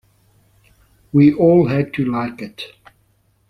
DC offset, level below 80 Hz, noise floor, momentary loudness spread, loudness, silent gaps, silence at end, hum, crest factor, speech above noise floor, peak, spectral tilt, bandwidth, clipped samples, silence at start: under 0.1%; -52 dBFS; -60 dBFS; 20 LU; -16 LUFS; none; 0.85 s; none; 18 dB; 45 dB; -2 dBFS; -9.5 dB/octave; 6 kHz; under 0.1%; 1.15 s